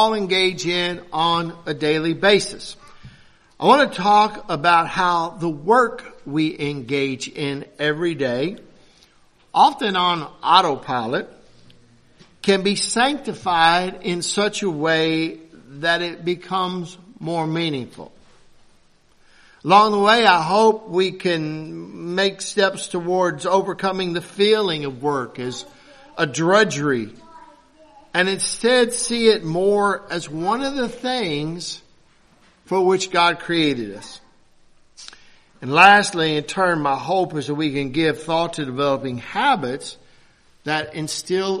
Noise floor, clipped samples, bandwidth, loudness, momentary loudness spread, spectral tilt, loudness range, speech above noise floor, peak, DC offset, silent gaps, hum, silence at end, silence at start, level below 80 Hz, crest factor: -55 dBFS; under 0.1%; 13 kHz; -19 LUFS; 12 LU; -4 dB/octave; 5 LU; 35 dB; 0 dBFS; under 0.1%; none; none; 0 s; 0 s; -56 dBFS; 20 dB